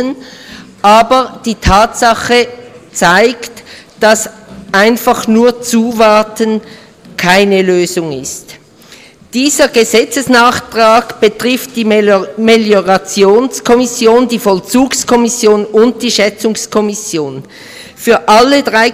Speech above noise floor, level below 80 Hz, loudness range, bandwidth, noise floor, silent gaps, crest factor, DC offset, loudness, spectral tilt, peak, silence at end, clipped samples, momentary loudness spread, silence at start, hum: 28 dB; -34 dBFS; 2 LU; 16.5 kHz; -38 dBFS; none; 10 dB; under 0.1%; -9 LUFS; -3.5 dB/octave; 0 dBFS; 0 s; 0.1%; 12 LU; 0 s; none